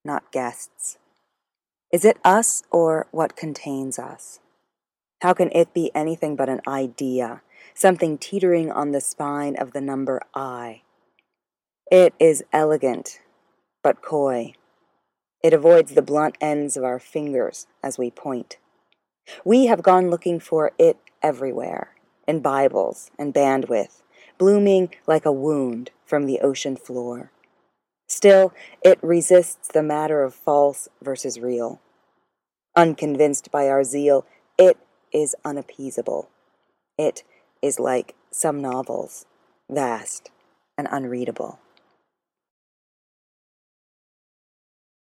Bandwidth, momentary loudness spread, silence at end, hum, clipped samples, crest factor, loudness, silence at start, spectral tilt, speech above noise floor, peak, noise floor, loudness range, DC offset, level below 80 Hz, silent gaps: 16 kHz; 16 LU; 3.6 s; none; under 0.1%; 20 dB; -20 LUFS; 0.05 s; -5 dB/octave; over 70 dB; 0 dBFS; under -90 dBFS; 8 LU; under 0.1%; -80 dBFS; none